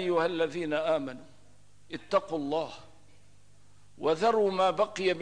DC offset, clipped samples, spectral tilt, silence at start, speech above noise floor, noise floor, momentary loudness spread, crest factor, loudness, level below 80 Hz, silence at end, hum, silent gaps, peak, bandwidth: 0.3%; under 0.1%; -5 dB/octave; 0 s; 33 dB; -61 dBFS; 17 LU; 16 dB; -29 LUFS; -68 dBFS; 0 s; 50 Hz at -65 dBFS; none; -14 dBFS; 10.5 kHz